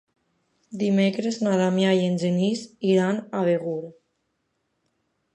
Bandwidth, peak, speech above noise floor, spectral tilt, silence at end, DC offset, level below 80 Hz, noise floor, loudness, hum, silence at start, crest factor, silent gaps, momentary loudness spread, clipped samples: 9.4 kHz; -8 dBFS; 52 dB; -6.5 dB/octave; 1.4 s; under 0.1%; -70 dBFS; -75 dBFS; -23 LUFS; none; 0.7 s; 16 dB; none; 9 LU; under 0.1%